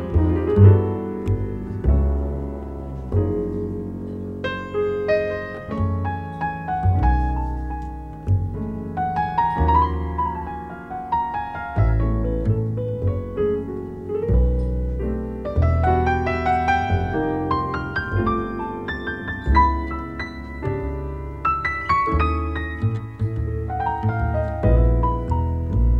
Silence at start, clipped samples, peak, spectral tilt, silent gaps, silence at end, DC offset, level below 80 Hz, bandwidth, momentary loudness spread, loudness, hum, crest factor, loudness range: 0 s; under 0.1%; -2 dBFS; -9 dB/octave; none; 0 s; 0.3%; -26 dBFS; 6 kHz; 11 LU; -23 LUFS; none; 20 dB; 4 LU